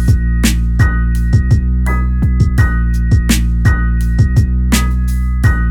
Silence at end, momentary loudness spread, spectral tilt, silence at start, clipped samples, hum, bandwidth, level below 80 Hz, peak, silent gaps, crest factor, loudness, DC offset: 0 s; 3 LU; -5.5 dB/octave; 0 s; under 0.1%; none; 16 kHz; -14 dBFS; 0 dBFS; none; 10 dB; -14 LUFS; under 0.1%